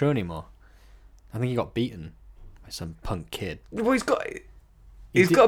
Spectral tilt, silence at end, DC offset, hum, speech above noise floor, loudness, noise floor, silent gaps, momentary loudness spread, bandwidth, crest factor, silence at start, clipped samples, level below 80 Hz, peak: -6 dB/octave; 0 s; under 0.1%; none; 27 dB; -28 LUFS; -52 dBFS; none; 17 LU; 17.5 kHz; 22 dB; 0 s; under 0.1%; -48 dBFS; -4 dBFS